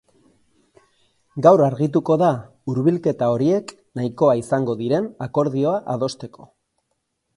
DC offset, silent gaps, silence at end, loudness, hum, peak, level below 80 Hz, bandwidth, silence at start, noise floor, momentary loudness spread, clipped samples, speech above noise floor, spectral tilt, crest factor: under 0.1%; none; 0.9 s; -20 LUFS; none; 0 dBFS; -62 dBFS; 11.5 kHz; 1.35 s; -74 dBFS; 12 LU; under 0.1%; 55 dB; -8 dB/octave; 20 dB